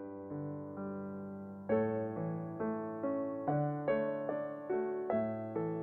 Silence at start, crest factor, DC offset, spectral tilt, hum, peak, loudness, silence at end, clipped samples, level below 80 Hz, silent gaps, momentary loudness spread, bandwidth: 0 s; 16 dB; under 0.1%; -11 dB/octave; none; -20 dBFS; -38 LUFS; 0 s; under 0.1%; -74 dBFS; none; 9 LU; 4.2 kHz